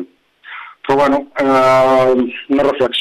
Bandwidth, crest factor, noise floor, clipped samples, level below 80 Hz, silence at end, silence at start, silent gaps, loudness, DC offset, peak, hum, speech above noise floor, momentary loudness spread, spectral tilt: 13.5 kHz; 12 dB; -39 dBFS; under 0.1%; -46 dBFS; 0 s; 0 s; none; -13 LUFS; under 0.1%; -2 dBFS; 50 Hz at -50 dBFS; 27 dB; 21 LU; -5.5 dB/octave